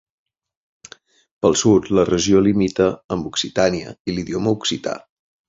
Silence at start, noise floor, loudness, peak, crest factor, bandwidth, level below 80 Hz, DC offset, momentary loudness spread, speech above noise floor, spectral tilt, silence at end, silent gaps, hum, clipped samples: 1.45 s; -46 dBFS; -19 LUFS; -2 dBFS; 18 dB; 7.8 kHz; -46 dBFS; under 0.1%; 11 LU; 28 dB; -5 dB/octave; 0.5 s; 3.04-3.09 s, 4.00-4.05 s; none; under 0.1%